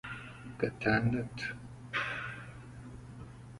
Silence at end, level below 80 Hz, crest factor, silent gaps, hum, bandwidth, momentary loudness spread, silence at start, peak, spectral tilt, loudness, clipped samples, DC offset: 0 s; -56 dBFS; 20 dB; none; none; 11.5 kHz; 19 LU; 0.05 s; -16 dBFS; -6.5 dB/octave; -35 LUFS; under 0.1%; under 0.1%